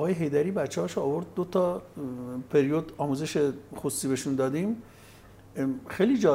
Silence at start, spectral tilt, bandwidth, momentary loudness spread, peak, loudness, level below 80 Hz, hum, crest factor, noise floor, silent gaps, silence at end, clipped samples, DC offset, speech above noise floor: 0 s; -6 dB/octave; 16 kHz; 10 LU; -10 dBFS; -29 LUFS; -62 dBFS; none; 18 dB; -51 dBFS; none; 0 s; under 0.1%; under 0.1%; 24 dB